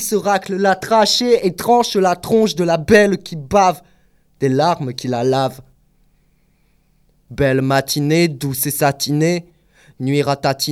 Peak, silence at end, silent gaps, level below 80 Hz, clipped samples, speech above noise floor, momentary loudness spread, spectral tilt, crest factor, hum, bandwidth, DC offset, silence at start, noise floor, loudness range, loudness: 0 dBFS; 0 s; none; -48 dBFS; under 0.1%; 42 dB; 9 LU; -4.5 dB/octave; 18 dB; none; 17.5 kHz; under 0.1%; 0 s; -58 dBFS; 7 LU; -16 LUFS